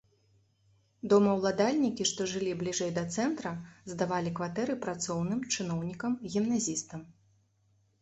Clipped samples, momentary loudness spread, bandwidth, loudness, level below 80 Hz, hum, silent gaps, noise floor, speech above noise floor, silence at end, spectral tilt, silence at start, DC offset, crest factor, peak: under 0.1%; 10 LU; 8.4 kHz; -31 LUFS; -66 dBFS; none; none; -70 dBFS; 39 dB; 0.9 s; -4.5 dB/octave; 1.05 s; under 0.1%; 20 dB; -12 dBFS